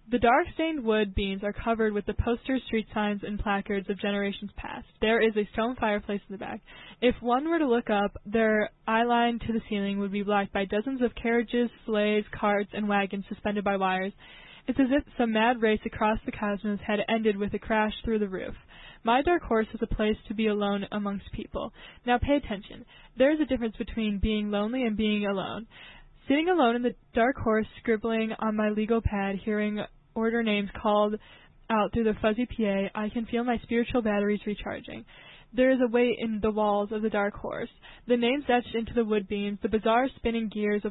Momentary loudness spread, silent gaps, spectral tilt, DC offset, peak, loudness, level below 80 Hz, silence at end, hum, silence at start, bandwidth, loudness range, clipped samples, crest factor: 11 LU; none; -10 dB/octave; under 0.1%; -12 dBFS; -28 LUFS; -46 dBFS; 0 s; none; 0.05 s; 4.1 kHz; 2 LU; under 0.1%; 16 dB